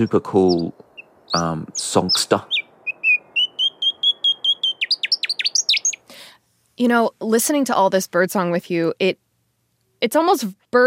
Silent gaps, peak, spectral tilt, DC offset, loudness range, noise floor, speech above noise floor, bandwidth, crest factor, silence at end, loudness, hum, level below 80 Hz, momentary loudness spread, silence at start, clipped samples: none; -2 dBFS; -3 dB/octave; under 0.1%; 2 LU; -67 dBFS; 49 dB; 16 kHz; 18 dB; 0 s; -19 LUFS; none; -62 dBFS; 6 LU; 0 s; under 0.1%